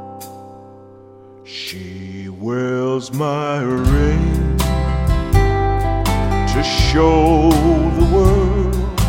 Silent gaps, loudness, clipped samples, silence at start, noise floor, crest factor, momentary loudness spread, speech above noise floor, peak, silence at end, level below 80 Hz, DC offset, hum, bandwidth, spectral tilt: none; -16 LUFS; under 0.1%; 0 s; -41 dBFS; 16 dB; 17 LU; 25 dB; 0 dBFS; 0 s; -20 dBFS; under 0.1%; none; 16.5 kHz; -6.5 dB/octave